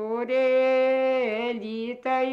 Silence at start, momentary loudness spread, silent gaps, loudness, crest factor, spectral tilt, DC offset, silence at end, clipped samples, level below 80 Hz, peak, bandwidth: 0 s; 10 LU; none; -24 LUFS; 10 dB; -5.5 dB/octave; under 0.1%; 0 s; under 0.1%; -72 dBFS; -14 dBFS; 6 kHz